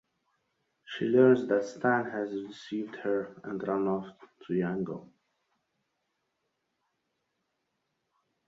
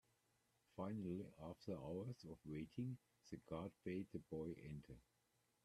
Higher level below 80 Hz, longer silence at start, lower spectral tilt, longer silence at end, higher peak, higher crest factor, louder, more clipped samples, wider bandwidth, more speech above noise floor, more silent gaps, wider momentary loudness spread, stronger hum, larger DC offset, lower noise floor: about the same, -74 dBFS vs -74 dBFS; first, 0.9 s vs 0.75 s; about the same, -7 dB/octave vs -8 dB/octave; first, 3.4 s vs 0.65 s; first, -10 dBFS vs -34 dBFS; about the same, 22 dB vs 18 dB; first, -30 LUFS vs -52 LUFS; neither; second, 7.6 kHz vs 13.5 kHz; first, 51 dB vs 33 dB; neither; first, 16 LU vs 10 LU; neither; neither; about the same, -81 dBFS vs -84 dBFS